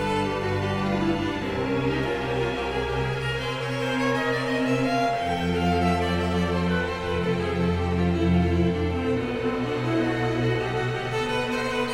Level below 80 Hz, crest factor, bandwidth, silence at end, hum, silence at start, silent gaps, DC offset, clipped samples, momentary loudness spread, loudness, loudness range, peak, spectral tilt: -40 dBFS; 14 dB; 13.5 kHz; 0 s; none; 0 s; none; under 0.1%; under 0.1%; 4 LU; -25 LUFS; 2 LU; -10 dBFS; -6.5 dB/octave